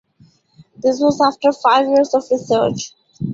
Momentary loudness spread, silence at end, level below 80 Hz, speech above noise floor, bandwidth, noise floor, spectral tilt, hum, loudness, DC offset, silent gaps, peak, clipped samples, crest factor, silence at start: 11 LU; 0 s; -56 dBFS; 37 dB; 7.8 kHz; -53 dBFS; -5 dB/octave; none; -16 LUFS; under 0.1%; none; 0 dBFS; under 0.1%; 16 dB; 0.85 s